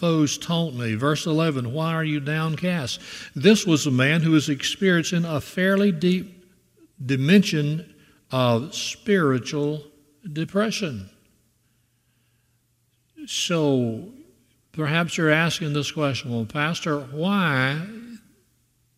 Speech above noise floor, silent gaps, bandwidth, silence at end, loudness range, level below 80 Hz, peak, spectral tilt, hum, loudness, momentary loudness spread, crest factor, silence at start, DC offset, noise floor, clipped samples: 45 dB; none; 15 kHz; 0.8 s; 8 LU; -62 dBFS; -2 dBFS; -5 dB/octave; none; -23 LUFS; 13 LU; 20 dB; 0 s; under 0.1%; -67 dBFS; under 0.1%